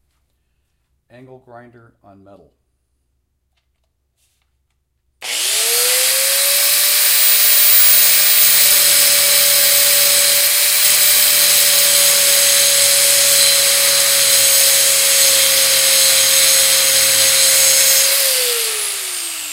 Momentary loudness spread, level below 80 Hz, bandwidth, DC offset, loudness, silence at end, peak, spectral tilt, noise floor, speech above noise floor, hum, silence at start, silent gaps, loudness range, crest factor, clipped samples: 5 LU; -62 dBFS; 16 kHz; under 0.1%; -9 LUFS; 0 s; 0 dBFS; 2.5 dB/octave; -67 dBFS; 25 dB; none; 1.55 s; none; 6 LU; 14 dB; under 0.1%